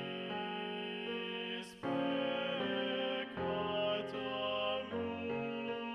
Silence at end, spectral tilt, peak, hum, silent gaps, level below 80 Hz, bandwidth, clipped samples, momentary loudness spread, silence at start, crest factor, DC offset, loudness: 0 s; -6 dB/octave; -24 dBFS; none; none; -72 dBFS; 12 kHz; under 0.1%; 5 LU; 0 s; 14 dB; under 0.1%; -38 LUFS